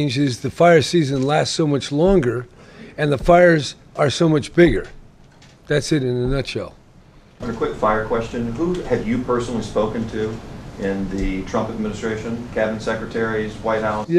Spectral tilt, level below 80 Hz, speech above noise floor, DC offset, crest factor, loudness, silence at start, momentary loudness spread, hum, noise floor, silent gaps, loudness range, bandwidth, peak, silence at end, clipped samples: -6 dB/octave; -36 dBFS; 28 dB; under 0.1%; 18 dB; -20 LUFS; 0 s; 12 LU; none; -47 dBFS; none; 7 LU; 12.5 kHz; -2 dBFS; 0 s; under 0.1%